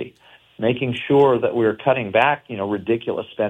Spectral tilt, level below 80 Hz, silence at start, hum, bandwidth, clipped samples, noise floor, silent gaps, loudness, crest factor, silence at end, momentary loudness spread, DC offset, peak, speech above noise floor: -8 dB/octave; -60 dBFS; 0 s; none; 8 kHz; under 0.1%; -52 dBFS; none; -20 LUFS; 18 dB; 0 s; 9 LU; under 0.1%; -2 dBFS; 32 dB